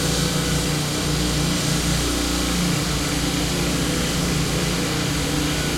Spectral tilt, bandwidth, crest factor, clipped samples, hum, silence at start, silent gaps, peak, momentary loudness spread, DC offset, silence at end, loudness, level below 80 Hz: -4 dB/octave; 16.5 kHz; 14 dB; under 0.1%; 60 Hz at -35 dBFS; 0 s; none; -8 dBFS; 1 LU; under 0.1%; 0 s; -21 LUFS; -32 dBFS